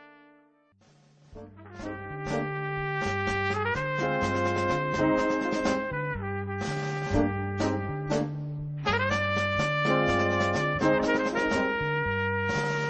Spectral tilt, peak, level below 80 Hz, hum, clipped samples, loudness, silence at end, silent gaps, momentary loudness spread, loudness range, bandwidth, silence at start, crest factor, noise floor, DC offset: -6 dB/octave; -10 dBFS; -50 dBFS; none; under 0.1%; -28 LUFS; 0 s; none; 8 LU; 5 LU; 8.8 kHz; 0 s; 18 dB; -62 dBFS; under 0.1%